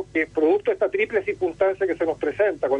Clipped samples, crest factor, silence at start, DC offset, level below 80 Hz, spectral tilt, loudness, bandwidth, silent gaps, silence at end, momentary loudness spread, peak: under 0.1%; 16 dB; 0 s; under 0.1%; -56 dBFS; -6.5 dB/octave; -23 LUFS; 8.6 kHz; none; 0 s; 4 LU; -8 dBFS